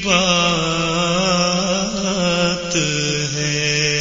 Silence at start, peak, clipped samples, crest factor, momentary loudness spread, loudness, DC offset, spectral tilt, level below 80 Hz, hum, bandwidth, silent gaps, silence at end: 0 s; -2 dBFS; under 0.1%; 16 dB; 5 LU; -17 LUFS; under 0.1%; -3.5 dB/octave; -42 dBFS; none; 7.6 kHz; none; 0 s